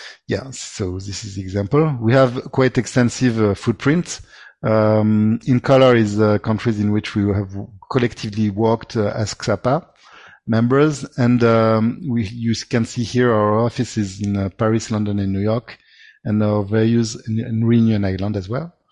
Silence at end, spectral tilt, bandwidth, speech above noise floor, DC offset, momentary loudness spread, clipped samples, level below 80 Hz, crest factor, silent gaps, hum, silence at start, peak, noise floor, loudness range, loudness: 0.25 s; -6.5 dB/octave; 11 kHz; 28 dB; under 0.1%; 10 LU; under 0.1%; -44 dBFS; 16 dB; none; none; 0 s; -2 dBFS; -45 dBFS; 4 LU; -18 LUFS